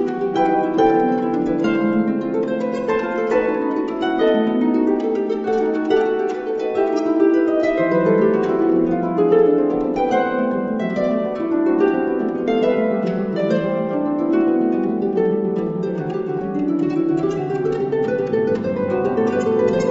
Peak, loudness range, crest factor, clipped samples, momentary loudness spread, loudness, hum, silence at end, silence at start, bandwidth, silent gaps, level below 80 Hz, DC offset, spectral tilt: -4 dBFS; 3 LU; 14 dB; under 0.1%; 5 LU; -19 LUFS; none; 0 s; 0 s; 7.8 kHz; none; -50 dBFS; under 0.1%; -8 dB/octave